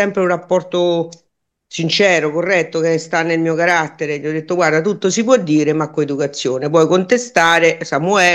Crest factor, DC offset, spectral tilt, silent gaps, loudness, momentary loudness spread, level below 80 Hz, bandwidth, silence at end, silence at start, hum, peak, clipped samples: 16 dB; under 0.1%; -4.5 dB/octave; none; -15 LUFS; 8 LU; -64 dBFS; 12 kHz; 0 s; 0 s; none; 0 dBFS; under 0.1%